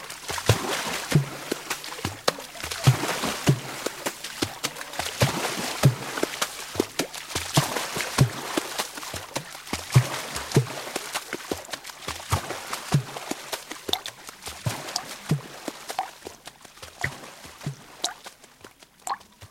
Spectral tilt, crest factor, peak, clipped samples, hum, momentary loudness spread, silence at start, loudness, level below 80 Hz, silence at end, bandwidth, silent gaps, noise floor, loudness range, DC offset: -4 dB/octave; 26 dB; -2 dBFS; under 0.1%; none; 14 LU; 0 s; -28 LUFS; -52 dBFS; 0.05 s; 16.5 kHz; none; -50 dBFS; 7 LU; under 0.1%